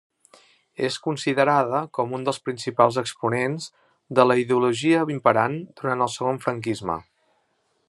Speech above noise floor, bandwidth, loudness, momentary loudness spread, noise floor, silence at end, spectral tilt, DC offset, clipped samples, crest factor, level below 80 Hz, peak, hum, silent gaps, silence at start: 47 dB; 12 kHz; -23 LUFS; 9 LU; -69 dBFS; 0.9 s; -5.5 dB/octave; under 0.1%; under 0.1%; 22 dB; -68 dBFS; -2 dBFS; none; none; 0.8 s